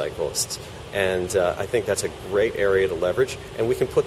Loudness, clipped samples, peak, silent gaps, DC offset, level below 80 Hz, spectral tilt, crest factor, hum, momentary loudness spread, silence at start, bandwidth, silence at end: -24 LUFS; under 0.1%; -8 dBFS; none; under 0.1%; -48 dBFS; -4 dB/octave; 16 dB; none; 6 LU; 0 s; 15 kHz; 0 s